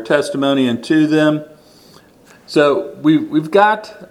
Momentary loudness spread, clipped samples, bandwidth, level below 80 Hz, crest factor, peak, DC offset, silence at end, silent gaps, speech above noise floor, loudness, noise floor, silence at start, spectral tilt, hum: 4 LU; under 0.1%; 12 kHz; -64 dBFS; 16 dB; 0 dBFS; under 0.1%; 0.05 s; none; 32 dB; -15 LUFS; -46 dBFS; 0 s; -6 dB/octave; none